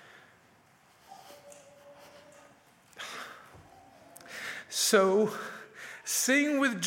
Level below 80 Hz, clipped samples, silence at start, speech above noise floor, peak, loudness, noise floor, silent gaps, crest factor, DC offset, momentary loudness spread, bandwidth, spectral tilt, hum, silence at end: -80 dBFS; under 0.1%; 1.1 s; 36 dB; -10 dBFS; -28 LUFS; -62 dBFS; none; 22 dB; under 0.1%; 27 LU; 16.5 kHz; -2.5 dB/octave; none; 0 s